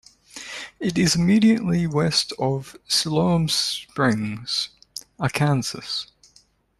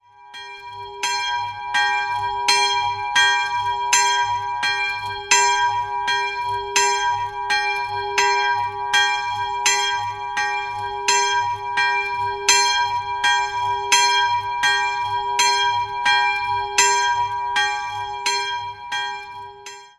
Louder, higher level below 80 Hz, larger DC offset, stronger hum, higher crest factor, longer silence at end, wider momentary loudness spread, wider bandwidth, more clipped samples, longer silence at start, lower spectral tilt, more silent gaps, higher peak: second, -22 LUFS vs -19 LUFS; about the same, -52 dBFS vs -54 dBFS; neither; neither; about the same, 18 dB vs 20 dB; first, 0.75 s vs 0.1 s; first, 17 LU vs 10 LU; second, 13 kHz vs 15.5 kHz; neither; first, 0.35 s vs 0.2 s; first, -4.5 dB/octave vs 1 dB/octave; neither; about the same, -4 dBFS vs -2 dBFS